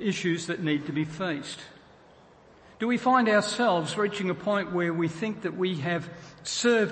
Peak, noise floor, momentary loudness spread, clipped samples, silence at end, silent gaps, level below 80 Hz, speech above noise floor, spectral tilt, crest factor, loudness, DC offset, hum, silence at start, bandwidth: -10 dBFS; -55 dBFS; 11 LU; under 0.1%; 0 s; none; -66 dBFS; 28 dB; -5 dB/octave; 16 dB; -27 LUFS; under 0.1%; none; 0 s; 8.8 kHz